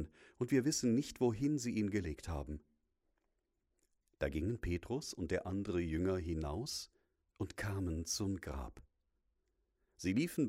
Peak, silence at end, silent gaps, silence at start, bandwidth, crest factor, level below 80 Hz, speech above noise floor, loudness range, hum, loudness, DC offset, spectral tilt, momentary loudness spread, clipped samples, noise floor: -22 dBFS; 0 s; none; 0 s; 16 kHz; 18 dB; -54 dBFS; 46 dB; 6 LU; none; -39 LUFS; under 0.1%; -5.5 dB/octave; 12 LU; under 0.1%; -84 dBFS